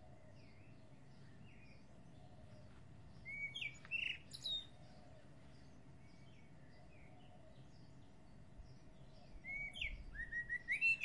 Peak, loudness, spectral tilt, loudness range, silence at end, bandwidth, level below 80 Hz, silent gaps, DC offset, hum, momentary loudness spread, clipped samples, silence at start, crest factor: -28 dBFS; -43 LUFS; -3 dB/octave; 16 LU; 0 s; 11.5 kHz; -64 dBFS; none; under 0.1%; none; 21 LU; under 0.1%; 0 s; 22 dB